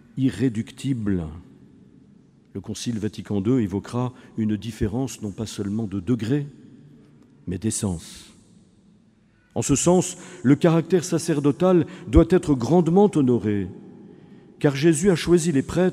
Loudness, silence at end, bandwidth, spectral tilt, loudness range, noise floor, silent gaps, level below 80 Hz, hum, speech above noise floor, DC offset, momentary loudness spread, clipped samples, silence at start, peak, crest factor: -22 LUFS; 0 s; 14.5 kHz; -6 dB/octave; 9 LU; -58 dBFS; none; -40 dBFS; none; 37 dB; under 0.1%; 14 LU; under 0.1%; 0.15 s; 0 dBFS; 22 dB